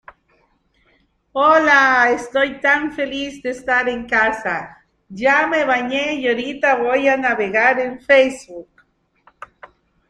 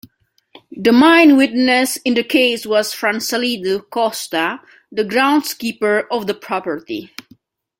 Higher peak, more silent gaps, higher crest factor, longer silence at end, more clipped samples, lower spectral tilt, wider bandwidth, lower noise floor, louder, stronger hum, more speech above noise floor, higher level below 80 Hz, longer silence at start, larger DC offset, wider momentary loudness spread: about the same, -2 dBFS vs 0 dBFS; neither; about the same, 18 dB vs 16 dB; first, 1.45 s vs 0.75 s; neither; about the same, -3.5 dB/octave vs -3 dB/octave; second, 10.5 kHz vs 16.5 kHz; about the same, -61 dBFS vs -58 dBFS; about the same, -16 LUFS vs -16 LUFS; neither; about the same, 44 dB vs 42 dB; first, -54 dBFS vs -62 dBFS; first, 1.35 s vs 0.75 s; neither; about the same, 13 LU vs 14 LU